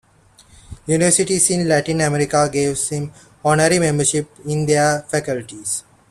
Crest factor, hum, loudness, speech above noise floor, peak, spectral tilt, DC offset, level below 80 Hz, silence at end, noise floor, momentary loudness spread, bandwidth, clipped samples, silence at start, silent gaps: 16 dB; none; -18 LUFS; 33 dB; -2 dBFS; -4 dB/octave; under 0.1%; -50 dBFS; 0.3 s; -51 dBFS; 11 LU; 13.5 kHz; under 0.1%; 0.7 s; none